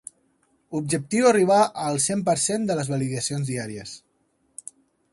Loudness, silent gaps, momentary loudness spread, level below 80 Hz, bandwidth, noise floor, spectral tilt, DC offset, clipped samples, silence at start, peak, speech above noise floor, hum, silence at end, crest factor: -23 LUFS; none; 22 LU; -62 dBFS; 11.5 kHz; -68 dBFS; -4.5 dB/octave; under 0.1%; under 0.1%; 0.7 s; -6 dBFS; 45 dB; none; 1.15 s; 18 dB